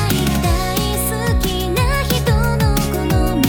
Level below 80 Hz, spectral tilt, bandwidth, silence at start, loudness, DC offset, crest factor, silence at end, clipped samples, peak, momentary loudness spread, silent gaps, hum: -22 dBFS; -5 dB/octave; 20 kHz; 0 s; -17 LUFS; under 0.1%; 14 dB; 0 s; under 0.1%; -2 dBFS; 2 LU; none; none